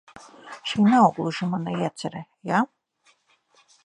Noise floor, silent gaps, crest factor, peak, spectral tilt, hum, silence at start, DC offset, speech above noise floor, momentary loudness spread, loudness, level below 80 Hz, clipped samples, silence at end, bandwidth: -64 dBFS; none; 20 dB; -6 dBFS; -6 dB/octave; none; 0.15 s; under 0.1%; 41 dB; 17 LU; -23 LUFS; -68 dBFS; under 0.1%; 1.2 s; 10.5 kHz